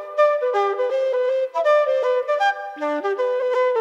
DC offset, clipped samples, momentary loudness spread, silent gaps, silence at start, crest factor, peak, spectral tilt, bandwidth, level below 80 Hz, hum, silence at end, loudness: under 0.1%; under 0.1%; 5 LU; none; 0 s; 12 dB; -8 dBFS; -1.5 dB/octave; 8 kHz; -86 dBFS; none; 0 s; -21 LUFS